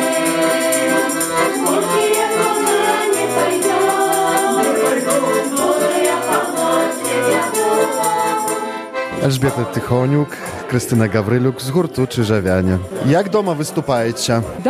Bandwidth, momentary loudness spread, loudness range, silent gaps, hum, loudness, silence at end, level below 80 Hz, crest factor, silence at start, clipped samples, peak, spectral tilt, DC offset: 15 kHz; 4 LU; 3 LU; none; none; -16 LUFS; 0 s; -52 dBFS; 16 dB; 0 s; under 0.1%; 0 dBFS; -4.5 dB/octave; under 0.1%